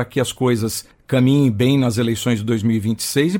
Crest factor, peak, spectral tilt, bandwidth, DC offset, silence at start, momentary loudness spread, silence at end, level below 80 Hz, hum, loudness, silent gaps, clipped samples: 12 dB; -4 dBFS; -5.5 dB/octave; 17 kHz; under 0.1%; 0 s; 6 LU; 0 s; -50 dBFS; none; -18 LUFS; none; under 0.1%